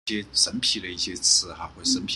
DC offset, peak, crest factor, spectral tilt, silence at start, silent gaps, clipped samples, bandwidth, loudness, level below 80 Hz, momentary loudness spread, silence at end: under 0.1%; -6 dBFS; 20 dB; -0.5 dB/octave; 0.05 s; none; under 0.1%; 12.5 kHz; -22 LUFS; -54 dBFS; 9 LU; 0 s